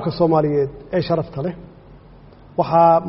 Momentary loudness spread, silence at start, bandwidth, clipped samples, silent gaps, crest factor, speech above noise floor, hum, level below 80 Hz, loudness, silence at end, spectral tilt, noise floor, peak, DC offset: 14 LU; 0 s; 5.8 kHz; under 0.1%; none; 18 dB; 27 dB; none; -46 dBFS; -19 LUFS; 0 s; -7 dB/octave; -44 dBFS; -2 dBFS; under 0.1%